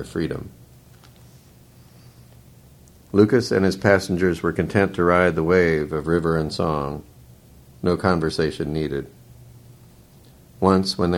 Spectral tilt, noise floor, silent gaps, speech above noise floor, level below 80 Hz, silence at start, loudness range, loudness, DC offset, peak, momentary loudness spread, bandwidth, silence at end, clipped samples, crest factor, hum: -6.5 dB/octave; -49 dBFS; none; 29 dB; -46 dBFS; 0 s; 7 LU; -21 LUFS; under 0.1%; 0 dBFS; 11 LU; 16.5 kHz; 0 s; under 0.1%; 22 dB; none